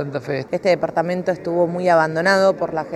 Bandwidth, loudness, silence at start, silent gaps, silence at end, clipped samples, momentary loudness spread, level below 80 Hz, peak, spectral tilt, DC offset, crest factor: 12.5 kHz; -19 LUFS; 0 s; none; 0 s; under 0.1%; 8 LU; -60 dBFS; -2 dBFS; -6 dB/octave; under 0.1%; 16 dB